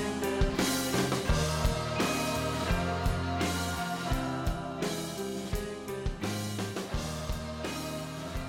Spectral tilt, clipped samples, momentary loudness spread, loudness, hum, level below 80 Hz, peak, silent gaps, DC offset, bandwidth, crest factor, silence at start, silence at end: -4.5 dB/octave; under 0.1%; 7 LU; -32 LUFS; none; -38 dBFS; -16 dBFS; none; under 0.1%; 18 kHz; 16 dB; 0 s; 0 s